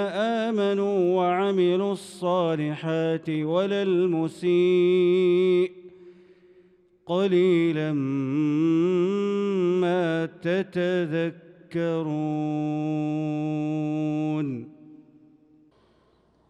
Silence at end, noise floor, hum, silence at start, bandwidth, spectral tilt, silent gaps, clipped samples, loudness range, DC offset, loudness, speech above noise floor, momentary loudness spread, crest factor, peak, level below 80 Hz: 1.5 s; -63 dBFS; none; 0 s; 10 kHz; -7.5 dB/octave; none; under 0.1%; 5 LU; under 0.1%; -24 LUFS; 39 dB; 7 LU; 12 dB; -12 dBFS; -74 dBFS